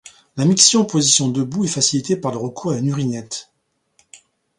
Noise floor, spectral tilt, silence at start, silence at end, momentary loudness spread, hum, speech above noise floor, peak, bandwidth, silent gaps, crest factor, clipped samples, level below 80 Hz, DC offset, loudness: -69 dBFS; -3.5 dB/octave; 0.05 s; 0.4 s; 15 LU; none; 52 dB; 0 dBFS; 11.5 kHz; none; 20 dB; under 0.1%; -60 dBFS; under 0.1%; -17 LUFS